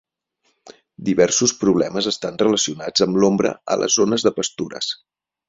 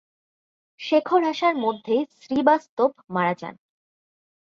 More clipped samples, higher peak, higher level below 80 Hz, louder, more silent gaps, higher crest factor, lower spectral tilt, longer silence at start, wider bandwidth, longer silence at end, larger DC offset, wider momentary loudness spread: neither; about the same, -2 dBFS vs -4 dBFS; first, -58 dBFS vs -70 dBFS; first, -19 LUFS vs -23 LUFS; second, none vs 2.69-2.77 s; about the same, 18 dB vs 20 dB; second, -3.5 dB/octave vs -6 dB/octave; second, 0.65 s vs 0.8 s; about the same, 8 kHz vs 7.4 kHz; second, 0.55 s vs 0.85 s; neither; about the same, 9 LU vs 8 LU